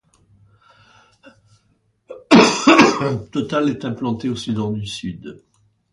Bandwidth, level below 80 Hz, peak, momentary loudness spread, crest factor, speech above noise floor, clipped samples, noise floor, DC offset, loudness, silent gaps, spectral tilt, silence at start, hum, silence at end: 11.5 kHz; -54 dBFS; 0 dBFS; 17 LU; 20 dB; 41 dB; under 0.1%; -63 dBFS; under 0.1%; -17 LUFS; none; -4.5 dB/octave; 2.1 s; none; 0.55 s